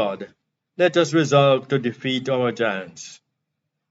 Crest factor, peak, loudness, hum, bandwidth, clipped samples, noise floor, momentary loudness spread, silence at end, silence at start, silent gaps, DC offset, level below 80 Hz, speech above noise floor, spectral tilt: 18 dB; -4 dBFS; -20 LUFS; none; 8 kHz; under 0.1%; -78 dBFS; 22 LU; 0.75 s; 0 s; none; under 0.1%; -76 dBFS; 58 dB; -5.5 dB/octave